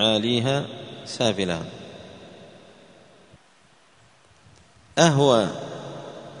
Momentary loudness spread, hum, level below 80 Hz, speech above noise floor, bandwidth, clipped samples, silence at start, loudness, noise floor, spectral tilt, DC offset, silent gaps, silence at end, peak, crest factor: 23 LU; none; -60 dBFS; 36 dB; 10.5 kHz; under 0.1%; 0 s; -22 LUFS; -57 dBFS; -4.5 dB/octave; under 0.1%; none; 0 s; 0 dBFS; 26 dB